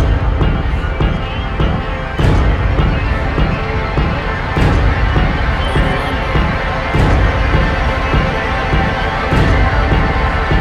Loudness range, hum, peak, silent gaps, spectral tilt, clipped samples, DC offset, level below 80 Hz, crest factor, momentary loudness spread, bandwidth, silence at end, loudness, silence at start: 2 LU; none; 0 dBFS; none; -7 dB/octave; under 0.1%; under 0.1%; -16 dBFS; 14 dB; 4 LU; 9.8 kHz; 0 s; -15 LUFS; 0 s